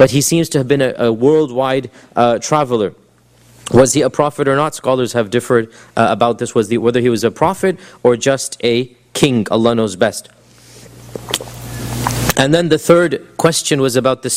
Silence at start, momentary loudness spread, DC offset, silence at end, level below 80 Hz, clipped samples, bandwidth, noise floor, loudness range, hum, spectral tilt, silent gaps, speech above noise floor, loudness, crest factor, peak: 0 s; 9 LU; under 0.1%; 0 s; -42 dBFS; under 0.1%; 16 kHz; -49 dBFS; 3 LU; none; -4.5 dB/octave; none; 35 dB; -15 LUFS; 14 dB; 0 dBFS